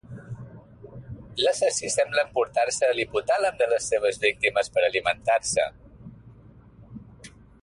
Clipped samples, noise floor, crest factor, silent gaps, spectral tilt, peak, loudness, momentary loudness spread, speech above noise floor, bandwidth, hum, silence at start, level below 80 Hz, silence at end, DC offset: under 0.1%; -50 dBFS; 18 dB; none; -2 dB/octave; -8 dBFS; -24 LUFS; 20 LU; 26 dB; 11.5 kHz; none; 0.1 s; -56 dBFS; 0.35 s; under 0.1%